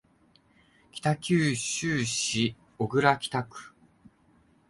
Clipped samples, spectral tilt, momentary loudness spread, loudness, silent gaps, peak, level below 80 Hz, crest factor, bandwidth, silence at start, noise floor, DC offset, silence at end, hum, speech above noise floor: under 0.1%; -4 dB/octave; 11 LU; -27 LUFS; none; -6 dBFS; -62 dBFS; 24 dB; 11.5 kHz; 0.95 s; -63 dBFS; under 0.1%; 1 s; none; 36 dB